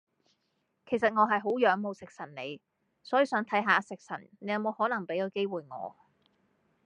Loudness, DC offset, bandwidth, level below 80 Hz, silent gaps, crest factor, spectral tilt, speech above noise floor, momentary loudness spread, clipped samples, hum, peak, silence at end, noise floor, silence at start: -29 LUFS; under 0.1%; 10 kHz; -80 dBFS; none; 22 dB; -5.5 dB/octave; 48 dB; 16 LU; under 0.1%; none; -8 dBFS; 0.95 s; -78 dBFS; 0.85 s